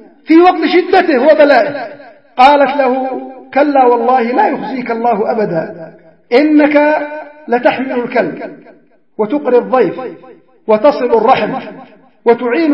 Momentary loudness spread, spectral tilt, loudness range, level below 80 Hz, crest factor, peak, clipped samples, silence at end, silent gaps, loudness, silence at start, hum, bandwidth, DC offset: 17 LU; -7 dB/octave; 5 LU; -56 dBFS; 12 dB; 0 dBFS; 0.2%; 0 s; none; -11 LUFS; 0.3 s; none; 6 kHz; 0.3%